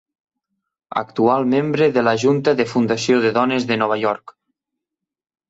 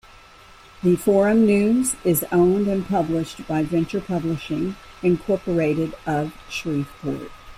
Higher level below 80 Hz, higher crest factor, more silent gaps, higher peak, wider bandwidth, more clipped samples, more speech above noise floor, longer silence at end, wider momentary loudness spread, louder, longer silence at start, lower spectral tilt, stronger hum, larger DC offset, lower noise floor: second, -60 dBFS vs -48 dBFS; about the same, 16 dB vs 16 dB; neither; first, -2 dBFS vs -6 dBFS; second, 8 kHz vs 16 kHz; neither; first, 66 dB vs 26 dB; first, 1.2 s vs 0.05 s; second, 8 LU vs 11 LU; first, -18 LUFS vs -22 LUFS; about the same, 0.9 s vs 0.85 s; about the same, -5.5 dB/octave vs -6 dB/octave; neither; neither; first, -84 dBFS vs -47 dBFS